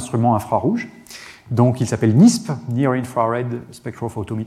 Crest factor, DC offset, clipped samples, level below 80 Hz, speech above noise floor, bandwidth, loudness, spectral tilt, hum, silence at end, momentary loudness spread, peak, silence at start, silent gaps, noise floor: 16 dB; under 0.1%; under 0.1%; -54 dBFS; 22 dB; 14 kHz; -18 LUFS; -7 dB/octave; none; 0 s; 20 LU; -2 dBFS; 0 s; none; -40 dBFS